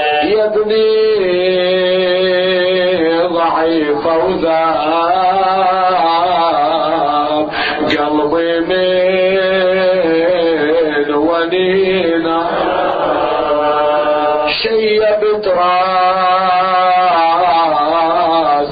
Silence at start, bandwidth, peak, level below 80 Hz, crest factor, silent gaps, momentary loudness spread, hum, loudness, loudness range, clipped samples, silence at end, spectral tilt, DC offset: 0 s; 5 kHz; -2 dBFS; -46 dBFS; 10 dB; none; 3 LU; none; -13 LUFS; 2 LU; under 0.1%; 0 s; -7.5 dB/octave; under 0.1%